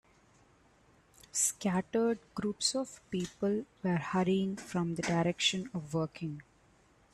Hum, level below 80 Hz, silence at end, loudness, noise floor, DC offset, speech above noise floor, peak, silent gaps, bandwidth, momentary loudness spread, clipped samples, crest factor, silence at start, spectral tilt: none; -66 dBFS; 0.7 s; -33 LUFS; -65 dBFS; under 0.1%; 32 dB; -16 dBFS; none; 13 kHz; 9 LU; under 0.1%; 18 dB; 1.35 s; -4 dB/octave